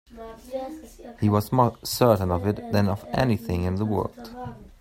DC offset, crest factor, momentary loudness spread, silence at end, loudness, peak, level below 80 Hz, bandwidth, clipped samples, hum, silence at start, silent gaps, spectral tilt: under 0.1%; 20 dB; 19 LU; 0.15 s; -24 LUFS; -4 dBFS; -48 dBFS; 16 kHz; under 0.1%; none; 0.1 s; none; -6.5 dB/octave